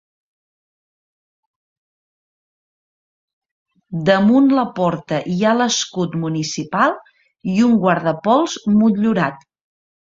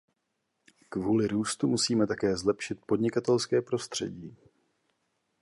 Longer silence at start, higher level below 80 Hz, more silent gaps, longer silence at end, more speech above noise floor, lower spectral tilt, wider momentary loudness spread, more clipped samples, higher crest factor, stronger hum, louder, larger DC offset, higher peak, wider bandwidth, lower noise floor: first, 3.9 s vs 0.9 s; about the same, -58 dBFS vs -62 dBFS; neither; second, 0.75 s vs 1.1 s; first, over 74 dB vs 52 dB; about the same, -5 dB/octave vs -4.5 dB/octave; about the same, 9 LU vs 10 LU; neither; about the same, 18 dB vs 18 dB; neither; first, -17 LUFS vs -29 LUFS; neither; first, 0 dBFS vs -12 dBFS; second, 7.8 kHz vs 11.5 kHz; first, under -90 dBFS vs -80 dBFS